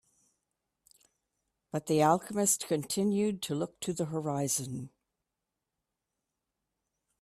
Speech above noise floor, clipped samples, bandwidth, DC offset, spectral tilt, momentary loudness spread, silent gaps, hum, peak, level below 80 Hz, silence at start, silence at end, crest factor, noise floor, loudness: 57 dB; under 0.1%; 15.5 kHz; under 0.1%; -4.5 dB/octave; 12 LU; none; none; -12 dBFS; -72 dBFS; 1.75 s; 2.35 s; 22 dB; -87 dBFS; -31 LUFS